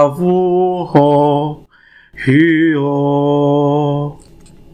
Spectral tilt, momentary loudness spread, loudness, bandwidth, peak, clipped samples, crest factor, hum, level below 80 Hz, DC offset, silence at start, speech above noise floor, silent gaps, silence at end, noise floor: -8.5 dB/octave; 10 LU; -13 LUFS; 11 kHz; 0 dBFS; under 0.1%; 14 dB; none; -48 dBFS; under 0.1%; 0 s; 34 dB; none; 0.55 s; -46 dBFS